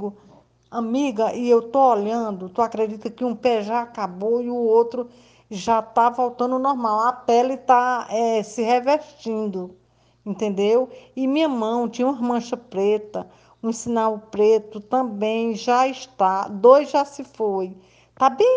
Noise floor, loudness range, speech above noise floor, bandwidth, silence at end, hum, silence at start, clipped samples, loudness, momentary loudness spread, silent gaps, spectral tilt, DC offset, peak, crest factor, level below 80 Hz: -53 dBFS; 4 LU; 32 dB; 9.4 kHz; 0 s; none; 0 s; under 0.1%; -21 LUFS; 11 LU; none; -5.5 dB/octave; under 0.1%; 0 dBFS; 20 dB; -66 dBFS